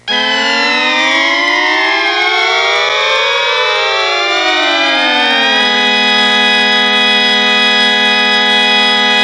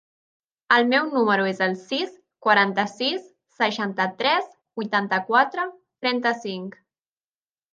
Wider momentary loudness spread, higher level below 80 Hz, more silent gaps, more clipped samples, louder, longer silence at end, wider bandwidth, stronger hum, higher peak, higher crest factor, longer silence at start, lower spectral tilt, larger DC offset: second, 3 LU vs 13 LU; first, -58 dBFS vs -78 dBFS; neither; neither; first, -9 LUFS vs -23 LUFS; second, 0 s vs 1 s; first, 11.5 kHz vs 9 kHz; first, 60 Hz at -50 dBFS vs none; about the same, -2 dBFS vs -4 dBFS; second, 8 dB vs 20 dB; second, 0.05 s vs 0.7 s; second, -1.5 dB/octave vs -5 dB/octave; neither